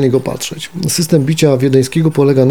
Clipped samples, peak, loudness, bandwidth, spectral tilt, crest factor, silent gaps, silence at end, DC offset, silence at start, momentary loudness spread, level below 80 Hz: under 0.1%; 0 dBFS; -13 LUFS; 19 kHz; -6 dB/octave; 12 dB; none; 0 s; 0.9%; 0 s; 10 LU; -48 dBFS